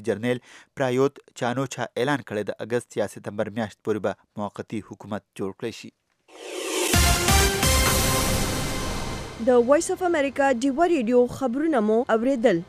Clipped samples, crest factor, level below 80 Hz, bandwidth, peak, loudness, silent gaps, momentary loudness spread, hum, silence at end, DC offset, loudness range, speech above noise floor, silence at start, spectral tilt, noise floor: under 0.1%; 18 dB; -34 dBFS; 16 kHz; -4 dBFS; -23 LUFS; none; 15 LU; none; 0.05 s; under 0.1%; 9 LU; 20 dB; 0 s; -4 dB/octave; -44 dBFS